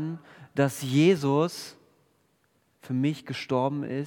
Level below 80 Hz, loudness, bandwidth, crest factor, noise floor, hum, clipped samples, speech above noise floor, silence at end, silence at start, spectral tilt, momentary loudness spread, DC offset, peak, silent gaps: -76 dBFS; -26 LUFS; 18 kHz; 18 dB; -69 dBFS; none; under 0.1%; 43 dB; 0 s; 0 s; -6.5 dB/octave; 15 LU; under 0.1%; -10 dBFS; none